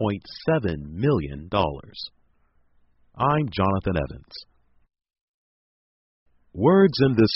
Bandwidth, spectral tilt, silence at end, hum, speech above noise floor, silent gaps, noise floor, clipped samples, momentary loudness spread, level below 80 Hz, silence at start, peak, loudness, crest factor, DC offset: 5.8 kHz; -6 dB/octave; 0 s; none; 40 dB; 5.21-6.26 s; -62 dBFS; under 0.1%; 20 LU; -46 dBFS; 0 s; -6 dBFS; -23 LUFS; 20 dB; under 0.1%